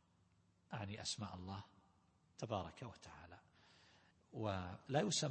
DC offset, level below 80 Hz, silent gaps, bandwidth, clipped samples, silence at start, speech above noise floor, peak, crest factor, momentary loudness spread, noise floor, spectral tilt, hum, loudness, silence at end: under 0.1%; -74 dBFS; none; 8.4 kHz; under 0.1%; 0.7 s; 31 dB; -24 dBFS; 24 dB; 21 LU; -76 dBFS; -4 dB/octave; none; -45 LUFS; 0 s